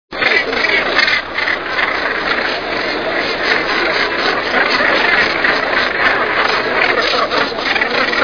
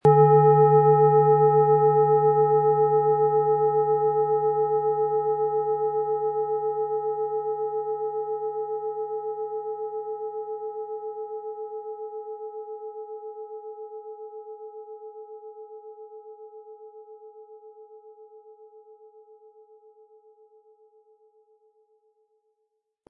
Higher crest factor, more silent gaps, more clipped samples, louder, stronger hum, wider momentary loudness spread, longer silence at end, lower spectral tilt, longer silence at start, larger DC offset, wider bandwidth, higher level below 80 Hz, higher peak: about the same, 16 dB vs 18 dB; neither; neither; first, -13 LUFS vs -23 LUFS; neither; second, 5 LU vs 24 LU; second, 0 s vs 4.6 s; second, -3 dB/octave vs -11.5 dB/octave; about the same, 0.1 s vs 0.05 s; first, 0.7% vs under 0.1%; first, 5.4 kHz vs 2.6 kHz; first, -44 dBFS vs -74 dBFS; first, 0 dBFS vs -6 dBFS